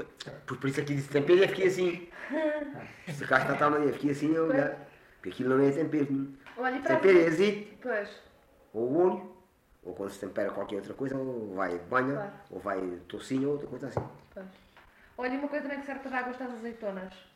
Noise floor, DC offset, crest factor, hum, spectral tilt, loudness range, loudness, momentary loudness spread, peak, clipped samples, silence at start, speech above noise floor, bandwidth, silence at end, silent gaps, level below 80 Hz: -61 dBFS; under 0.1%; 20 dB; none; -6.5 dB/octave; 9 LU; -30 LUFS; 17 LU; -10 dBFS; under 0.1%; 0 s; 31 dB; 13 kHz; 0.15 s; none; -66 dBFS